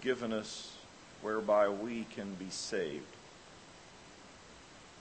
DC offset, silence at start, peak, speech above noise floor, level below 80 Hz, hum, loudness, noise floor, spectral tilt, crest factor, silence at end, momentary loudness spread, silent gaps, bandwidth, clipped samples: under 0.1%; 0 s; -16 dBFS; 20 dB; -70 dBFS; none; -36 LUFS; -56 dBFS; -4 dB/octave; 22 dB; 0 s; 24 LU; none; 8.4 kHz; under 0.1%